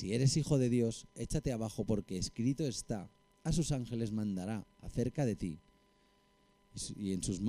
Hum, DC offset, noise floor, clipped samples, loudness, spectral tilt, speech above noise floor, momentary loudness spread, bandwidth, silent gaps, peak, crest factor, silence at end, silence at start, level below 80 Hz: none; under 0.1%; -70 dBFS; under 0.1%; -36 LUFS; -6 dB/octave; 35 dB; 12 LU; 15 kHz; none; -18 dBFS; 18 dB; 0 s; 0 s; -52 dBFS